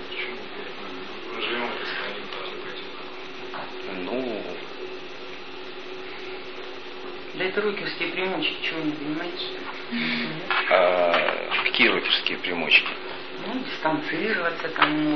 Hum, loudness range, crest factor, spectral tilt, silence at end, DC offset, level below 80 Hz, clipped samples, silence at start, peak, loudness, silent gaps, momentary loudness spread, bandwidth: none; 13 LU; 24 dB; -5 dB/octave; 0 s; 1%; -68 dBFS; under 0.1%; 0 s; -4 dBFS; -25 LUFS; none; 18 LU; 6.6 kHz